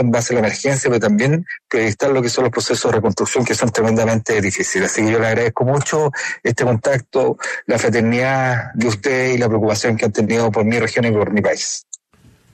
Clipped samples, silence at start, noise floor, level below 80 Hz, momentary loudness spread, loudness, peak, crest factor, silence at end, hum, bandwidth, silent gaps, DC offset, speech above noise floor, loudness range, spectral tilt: under 0.1%; 0 s; -51 dBFS; -52 dBFS; 4 LU; -17 LUFS; -4 dBFS; 12 dB; 0.75 s; none; 13.5 kHz; none; under 0.1%; 35 dB; 1 LU; -5 dB/octave